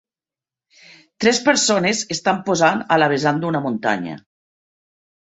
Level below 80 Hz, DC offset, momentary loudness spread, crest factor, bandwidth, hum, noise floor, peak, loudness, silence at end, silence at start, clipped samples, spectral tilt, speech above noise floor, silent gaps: -62 dBFS; under 0.1%; 7 LU; 20 dB; 8.4 kHz; none; under -90 dBFS; -2 dBFS; -18 LUFS; 1.15 s; 1.2 s; under 0.1%; -3.5 dB/octave; over 72 dB; none